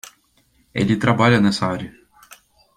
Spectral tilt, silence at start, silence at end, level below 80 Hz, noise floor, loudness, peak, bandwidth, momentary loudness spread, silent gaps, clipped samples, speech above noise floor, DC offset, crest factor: -6 dB/octave; 0.75 s; 0.85 s; -52 dBFS; -60 dBFS; -18 LUFS; -2 dBFS; 15.5 kHz; 15 LU; none; under 0.1%; 43 dB; under 0.1%; 18 dB